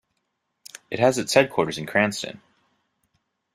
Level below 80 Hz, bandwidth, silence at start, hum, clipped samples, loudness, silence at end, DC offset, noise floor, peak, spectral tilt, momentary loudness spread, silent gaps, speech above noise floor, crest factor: -64 dBFS; 15.5 kHz; 0.9 s; none; under 0.1%; -22 LUFS; 1.2 s; under 0.1%; -76 dBFS; -2 dBFS; -4 dB/octave; 18 LU; none; 54 dB; 24 dB